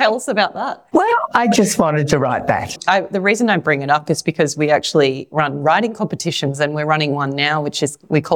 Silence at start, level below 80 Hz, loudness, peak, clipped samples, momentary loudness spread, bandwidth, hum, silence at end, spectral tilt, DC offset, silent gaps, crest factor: 0 s; -52 dBFS; -17 LUFS; -2 dBFS; under 0.1%; 5 LU; 18 kHz; none; 0 s; -4.5 dB/octave; under 0.1%; none; 14 dB